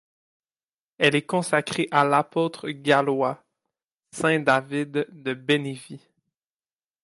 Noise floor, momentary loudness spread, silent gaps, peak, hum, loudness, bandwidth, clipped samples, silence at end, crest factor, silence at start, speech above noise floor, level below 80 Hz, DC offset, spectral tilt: under -90 dBFS; 11 LU; 3.92-4.01 s; -4 dBFS; none; -23 LUFS; 11.5 kHz; under 0.1%; 1.05 s; 20 dB; 1 s; over 67 dB; -70 dBFS; under 0.1%; -5 dB/octave